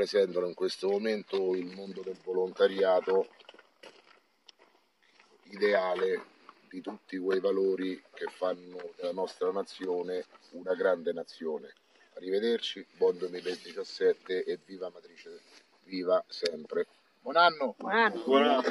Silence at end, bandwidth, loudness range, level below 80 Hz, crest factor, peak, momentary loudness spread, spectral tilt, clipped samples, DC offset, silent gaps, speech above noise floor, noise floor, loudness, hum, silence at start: 0 s; 12 kHz; 5 LU; -86 dBFS; 22 dB; -10 dBFS; 17 LU; -4.5 dB/octave; under 0.1%; under 0.1%; none; 36 dB; -67 dBFS; -31 LUFS; none; 0 s